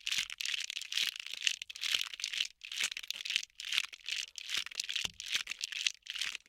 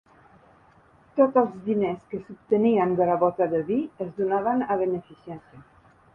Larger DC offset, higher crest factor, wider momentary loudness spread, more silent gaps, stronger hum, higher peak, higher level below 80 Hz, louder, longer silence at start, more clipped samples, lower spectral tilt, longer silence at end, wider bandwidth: neither; first, 32 dB vs 18 dB; second, 4 LU vs 16 LU; neither; neither; about the same, -6 dBFS vs -8 dBFS; second, -74 dBFS vs -64 dBFS; second, -35 LUFS vs -24 LUFS; second, 0.05 s vs 1.15 s; neither; second, 3 dB/octave vs -10 dB/octave; second, 0.1 s vs 0.5 s; first, 17 kHz vs 3.7 kHz